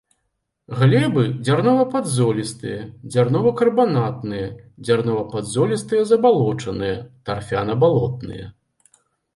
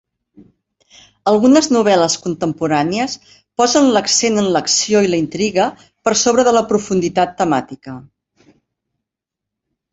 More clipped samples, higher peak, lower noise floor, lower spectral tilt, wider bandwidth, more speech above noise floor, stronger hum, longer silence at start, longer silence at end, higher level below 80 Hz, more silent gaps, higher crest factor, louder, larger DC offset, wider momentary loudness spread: neither; second, -4 dBFS vs 0 dBFS; second, -74 dBFS vs -83 dBFS; first, -6.5 dB/octave vs -3.5 dB/octave; first, 11.5 kHz vs 8.4 kHz; second, 55 dB vs 68 dB; neither; second, 0.7 s vs 1.25 s; second, 0.85 s vs 1.9 s; about the same, -52 dBFS vs -54 dBFS; neither; about the same, 16 dB vs 16 dB; second, -19 LUFS vs -15 LUFS; neither; first, 14 LU vs 10 LU